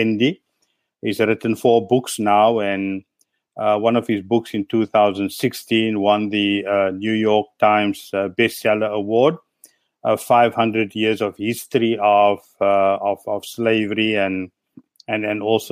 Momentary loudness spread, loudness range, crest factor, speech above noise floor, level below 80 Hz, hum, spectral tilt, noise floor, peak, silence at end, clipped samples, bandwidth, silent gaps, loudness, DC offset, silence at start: 8 LU; 2 LU; 16 dB; 52 dB; -66 dBFS; none; -5.5 dB/octave; -70 dBFS; -2 dBFS; 0 s; under 0.1%; 15.5 kHz; none; -19 LUFS; under 0.1%; 0 s